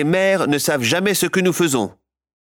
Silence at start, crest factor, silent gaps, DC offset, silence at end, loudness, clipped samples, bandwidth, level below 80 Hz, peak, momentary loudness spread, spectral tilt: 0 s; 12 dB; none; under 0.1%; 0.55 s; -17 LUFS; under 0.1%; over 20 kHz; -60 dBFS; -6 dBFS; 3 LU; -4 dB/octave